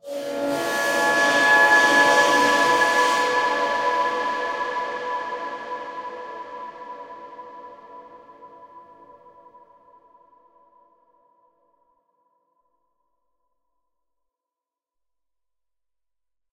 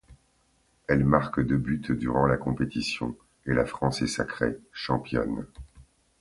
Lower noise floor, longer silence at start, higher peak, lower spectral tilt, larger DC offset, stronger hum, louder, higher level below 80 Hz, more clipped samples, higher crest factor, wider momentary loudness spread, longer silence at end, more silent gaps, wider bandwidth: first, under -90 dBFS vs -67 dBFS; about the same, 0.05 s vs 0.1 s; about the same, -4 dBFS vs -4 dBFS; second, -1.5 dB/octave vs -6 dB/octave; neither; neither; first, -19 LUFS vs -27 LUFS; second, -66 dBFS vs -46 dBFS; neither; about the same, 20 dB vs 24 dB; first, 23 LU vs 12 LU; first, 7.7 s vs 0.4 s; neither; first, 16 kHz vs 11.5 kHz